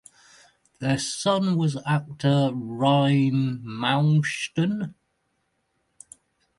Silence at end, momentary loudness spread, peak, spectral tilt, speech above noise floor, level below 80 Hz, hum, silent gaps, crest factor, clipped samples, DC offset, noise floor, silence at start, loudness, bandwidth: 1.65 s; 7 LU; -8 dBFS; -6 dB/octave; 50 dB; -64 dBFS; none; none; 18 dB; under 0.1%; under 0.1%; -73 dBFS; 0.8 s; -24 LUFS; 11.5 kHz